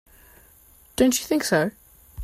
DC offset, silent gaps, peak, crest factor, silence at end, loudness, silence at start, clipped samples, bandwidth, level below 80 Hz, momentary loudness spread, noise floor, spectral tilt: under 0.1%; none; -6 dBFS; 20 dB; 0 s; -22 LUFS; 1 s; under 0.1%; 16 kHz; -52 dBFS; 9 LU; -53 dBFS; -4 dB/octave